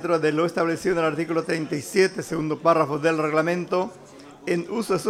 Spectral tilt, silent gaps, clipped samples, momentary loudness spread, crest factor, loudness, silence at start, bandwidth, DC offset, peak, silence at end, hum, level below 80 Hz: -5.5 dB/octave; none; under 0.1%; 7 LU; 18 dB; -23 LUFS; 0 s; 15.5 kHz; under 0.1%; -6 dBFS; 0 s; none; -60 dBFS